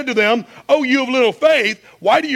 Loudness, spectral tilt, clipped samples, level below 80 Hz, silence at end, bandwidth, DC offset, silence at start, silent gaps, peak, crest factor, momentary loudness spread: -16 LUFS; -3.5 dB/octave; under 0.1%; -66 dBFS; 0 s; 15.5 kHz; under 0.1%; 0 s; none; -2 dBFS; 14 dB; 7 LU